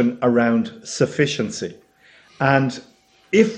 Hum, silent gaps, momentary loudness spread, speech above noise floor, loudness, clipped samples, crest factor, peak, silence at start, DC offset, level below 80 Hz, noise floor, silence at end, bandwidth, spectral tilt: none; none; 11 LU; 33 dB; -20 LUFS; under 0.1%; 18 dB; -2 dBFS; 0 s; under 0.1%; -60 dBFS; -52 dBFS; 0 s; 9.8 kHz; -5.5 dB/octave